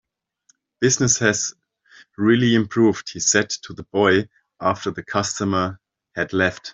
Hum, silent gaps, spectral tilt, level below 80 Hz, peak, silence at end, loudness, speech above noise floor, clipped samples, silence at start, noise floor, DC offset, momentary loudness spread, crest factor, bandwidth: none; none; -3.5 dB/octave; -58 dBFS; -2 dBFS; 0 s; -20 LUFS; 43 dB; under 0.1%; 0.8 s; -63 dBFS; under 0.1%; 11 LU; 18 dB; 8.2 kHz